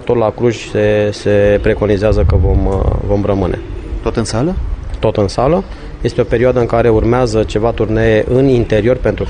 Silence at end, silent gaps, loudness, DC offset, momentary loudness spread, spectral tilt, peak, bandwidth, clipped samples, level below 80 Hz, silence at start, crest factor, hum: 0 s; none; -13 LUFS; under 0.1%; 7 LU; -7 dB/octave; 0 dBFS; 9.8 kHz; under 0.1%; -22 dBFS; 0 s; 12 dB; none